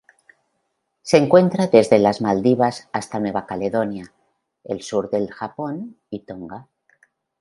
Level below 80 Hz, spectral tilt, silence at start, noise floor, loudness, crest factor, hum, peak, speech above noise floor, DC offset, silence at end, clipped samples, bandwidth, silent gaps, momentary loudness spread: -60 dBFS; -6.5 dB/octave; 1.05 s; -73 dBFS; -19 LUFS; 20 dB; none; 0 dBFS; 54 dB; under 0.1%; 0.8 s; under 0.1%; 11.5 kHz; none; 20 LU